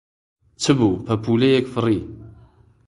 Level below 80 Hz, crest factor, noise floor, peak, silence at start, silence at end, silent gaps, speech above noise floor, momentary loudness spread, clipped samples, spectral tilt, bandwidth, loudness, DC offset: -48 dBFS; 20 dB; -51 dBFS; -2 dBFS; 0.6 s; 0.55 s; none; 33 dB; 8 LU; under 0.1%; -6 dB/octave; 11 kHz; -20 LUFS; under 0.1%